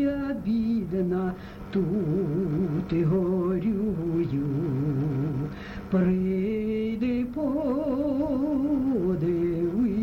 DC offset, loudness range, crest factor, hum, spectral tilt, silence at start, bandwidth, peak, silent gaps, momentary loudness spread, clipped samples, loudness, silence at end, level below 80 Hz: under 0.1%; 1 LU; 12 dB; none; -10 dB/octave; 0 s; 6.4 kHz; -14 dBFS; none; 4 LU; under 0.1%; -27 LUFS; 0 s; -46 dBFS